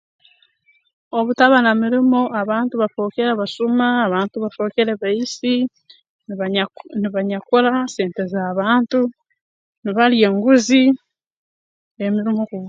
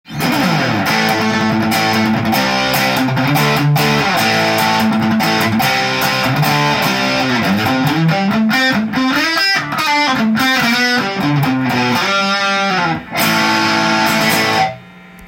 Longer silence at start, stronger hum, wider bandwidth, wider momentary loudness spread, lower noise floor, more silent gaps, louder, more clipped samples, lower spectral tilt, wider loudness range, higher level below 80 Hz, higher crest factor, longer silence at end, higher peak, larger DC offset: first, 1.15 s vs 0.1 s; neither; second, 7.6 kHz vs 17 kHz; first, 11 LU vs 3 LU; first, -60 dBFS vs -37 dBFS; first, 6.09-6.19 s, 9.41-9.82 s, 11.27-11.31 s, 11.37-11.95 s vs none; second, -18 LUFS vs -13 LUFS; neither; about the same, -5 dB/octave vs -4.5 dB/octave; first, 4 LU vs 1 LU; second, -68 dBFS vs -48 dBFS; about the same, 18 dB vs 14 dB; about the same, 0 s vs 0 s; about the same, 0 dBFS vs 0 dBFS; neither